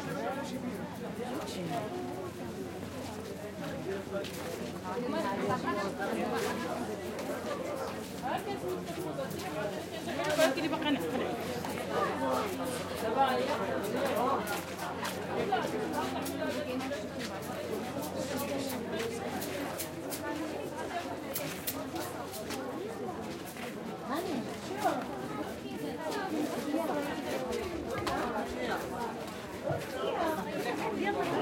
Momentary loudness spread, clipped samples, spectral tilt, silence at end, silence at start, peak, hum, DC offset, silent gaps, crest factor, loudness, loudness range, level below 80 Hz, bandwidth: 7 LU; under 0.1%; -4.5 dB/octave; 0 s; 0 s; -14 dBFS; none; under 0.1%; none; 20 dB; -35 LUFS; 5 LU; -64 dBFS; 16.5 kHz